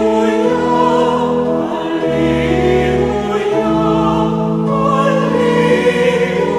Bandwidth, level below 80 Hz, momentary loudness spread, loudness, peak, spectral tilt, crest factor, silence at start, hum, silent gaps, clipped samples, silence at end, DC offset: 12.5 kHz; -34 dBFS; 4 LU; -14 LUFS; 0 dBFS; -6.5 dB/octave; 12 dB; 0 s; none; none; under 0.1%; 0 s; under 0.1%